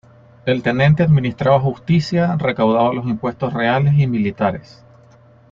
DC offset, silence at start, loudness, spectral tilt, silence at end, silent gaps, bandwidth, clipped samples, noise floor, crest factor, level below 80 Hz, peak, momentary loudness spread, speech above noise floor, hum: under 0.1%; 0.45 s; -17 LUFS; -8.5 dB/octave; 0.9 s; none; 7.4 kHz; under 0.1%; -47 dBFS; 14 dB; -48 dBFS; -2 dBFS; 7 LU; 31 dB; none